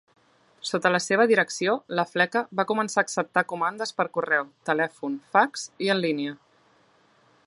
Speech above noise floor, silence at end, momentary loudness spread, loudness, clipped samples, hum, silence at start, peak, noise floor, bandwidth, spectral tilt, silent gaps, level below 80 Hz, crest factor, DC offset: 37 dB; 1.1 s; 7 LU; -25 LUFS; under 0.1%; none; 0.65 s; -6 dBFS; -61 dBFS; 11.5 kHz; -4 dB/octave; none; -78 dBFS; 20 dB; under 0.1%